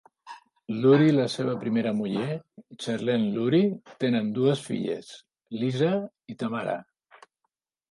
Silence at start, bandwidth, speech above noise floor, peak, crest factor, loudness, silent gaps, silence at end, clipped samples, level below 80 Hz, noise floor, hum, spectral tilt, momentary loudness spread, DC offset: 0.25 s; 11.5 kHz; 56 dB; -8 dBFS; 18 dB; -26 LUFS; none; 1.1 s; under 0.1%; -70 dBFS; -81 dBFS; none; -7 dB/octave; 17 LU; under 0.1%